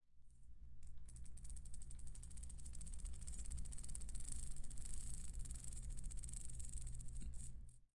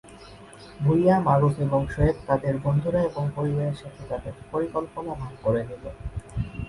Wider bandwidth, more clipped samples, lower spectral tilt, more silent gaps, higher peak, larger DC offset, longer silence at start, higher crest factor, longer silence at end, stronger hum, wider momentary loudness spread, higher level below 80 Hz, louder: about the same, 11.5 kHz vs 11.5 kHz; neither; second, -3.5 dB/octave vs -9 dB/octave; neither; second, -32 dBFS vs -6 dBFS; neither; about the same, 0.1 s vs 0.05 s; about the same, 16 dB vs 18 dB; about the same, 0.1 s vs 0 s; neither; second, 9 LU vs 17 LU; second, -52 dBFS vs -40 dBFS; second, -54 LUFS vs -25 LUFS